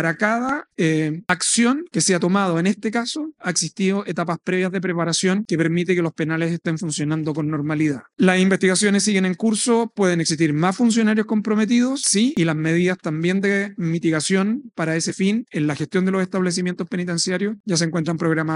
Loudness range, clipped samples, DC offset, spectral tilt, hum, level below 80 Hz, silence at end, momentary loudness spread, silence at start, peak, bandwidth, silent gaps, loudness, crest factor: 3 LU; under 0.1%; under 0.1%; -4.5 dB/octave; none; -66 dBFS; 0 s; 7 LU; 0 s; 0 dBFS; 11.5 kHz; 17.60-17.64 s; -20 LUFS; 20 dB